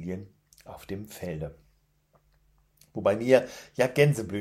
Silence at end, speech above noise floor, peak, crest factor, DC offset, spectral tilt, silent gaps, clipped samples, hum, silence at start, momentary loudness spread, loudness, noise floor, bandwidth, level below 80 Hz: 0 s; 40 dB; -6 dBFS; 22 dB; under 0.1%; -6 dB/octave; none; under 0.1%; 50 Hz at -60 dBFS; 0 s; 18 LU; -27 LUFS; -67 dBFS; 15.5 kHz; -60 dBFS